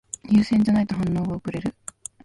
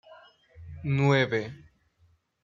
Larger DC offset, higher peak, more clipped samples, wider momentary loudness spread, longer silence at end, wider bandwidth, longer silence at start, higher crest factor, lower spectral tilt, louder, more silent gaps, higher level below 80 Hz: neither; about the same, -8 dBFS vs -10 dBFS; neither; second, 14 LU vs 18 LU; second, 0.55 s vs 0.85 s; first, 11.5 kHz vs 7.4 kHz; first, 0.25 s vs 0.1 s; second, 14 dB vs 20 dB; about the same, -6.5 dB/octave vs -7 dB/octave; first, -22 LUFS vs -26 LUFS; neither; first, -48 dBFS vs -62 dBFS